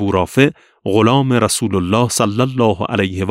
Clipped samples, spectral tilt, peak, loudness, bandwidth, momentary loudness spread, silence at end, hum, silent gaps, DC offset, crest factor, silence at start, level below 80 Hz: under 0.1%; -5 dB/octave; 0 dBFS; -15 LUFS; 16 kHz; 5 LU; 0 s; none; none; under 0.1%; 14 dB; 0 s; -46 dBFS